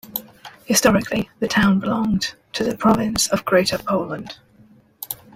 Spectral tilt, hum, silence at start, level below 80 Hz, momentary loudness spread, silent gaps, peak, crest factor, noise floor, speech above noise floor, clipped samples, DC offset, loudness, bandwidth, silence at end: -4 dB/octave; none; 0.05 s; -46 dBFS; 14 LU; none; -2 dBFS; 18 dB; -52 dBFS; 33 dB; under 0.1%; under 0.1%; -19 LUFS; 16 kHz; 0.2 s